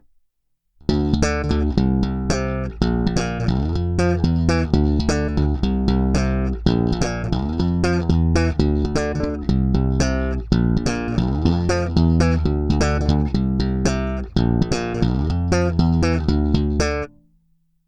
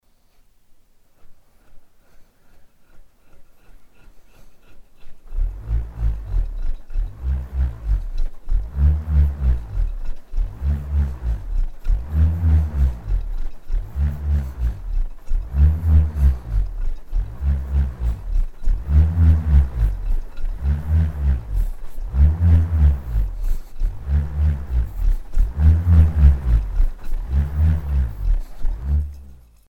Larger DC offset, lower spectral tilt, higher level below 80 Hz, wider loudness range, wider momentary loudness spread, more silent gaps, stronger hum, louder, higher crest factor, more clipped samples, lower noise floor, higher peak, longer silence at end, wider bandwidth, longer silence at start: neither; second, -6.5 dB/octave vs -9 dB/octave; second, -26 dBFS vs -20 dBFS; second, 1 LU vs 9 LU; second, 4 LU vs 14 LU; neither; neither; about the same, -20 LUFS vs -22 LUFS; about the same, 18 dB vs 18 dB; neither; first, -69 dBFS vs -53 dBFS; about the same, 0 dBFS vs -2 dBFS; first, 0.8 s vs 0.35 s; first, 10 kHz vs 3.1 kHz; first, 0.9 s vs 0.7 s